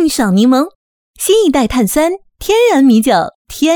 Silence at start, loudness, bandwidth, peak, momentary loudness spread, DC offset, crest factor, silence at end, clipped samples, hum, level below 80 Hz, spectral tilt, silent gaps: 0 s; -12 LUFS; over 20 kHz; 0 dBFS; 10 LU; under 0.1%; 12 dB; 0 s; under 0.1%; none; -38 dBFS; -4.5 dB/octave; 0.75-1.14 s, 3.35-3.45 s